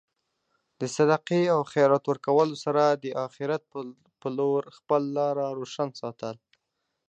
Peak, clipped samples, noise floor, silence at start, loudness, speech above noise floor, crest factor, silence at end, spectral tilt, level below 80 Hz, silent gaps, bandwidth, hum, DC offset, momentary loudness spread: -8 dBFS; under 0.1%; -81 dBFS; 0.8 s; -26 LUFS; 55 dB; 20 dB; 0.75 s; -6 dB/octave; -78 dBFS; none; 8.8 kHz; none; under 0.1%; 15 LU